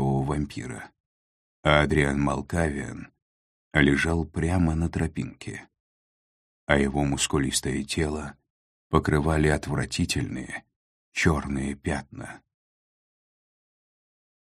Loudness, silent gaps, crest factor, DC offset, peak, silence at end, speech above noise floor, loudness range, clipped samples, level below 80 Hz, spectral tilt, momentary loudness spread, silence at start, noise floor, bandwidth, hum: -26 LUFS; 1.00-1.63 s, 3.22-3.71 s, 5.80-6.67 s, 8.50-8.90 s, 10.76-11.12 s; 26 dB; under 0.1%; -2 dBFS; 2.15 s; over 65 dB; 6 LU; under 0.1%; -40 dBFS; -5 dB/octave; 17 LU; 0 s; under -90 dBFS; 13.5 kHz; none